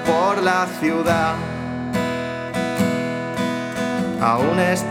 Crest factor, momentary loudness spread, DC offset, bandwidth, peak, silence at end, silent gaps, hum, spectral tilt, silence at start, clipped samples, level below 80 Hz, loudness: 18 dB; 7 LU; under 0.1%; 17.5 kHz; -2 dBFS; 0 s; none; none; -5.5 dB/octave; 0 s; under 0.1%; -52 dBFS; -21 LUFS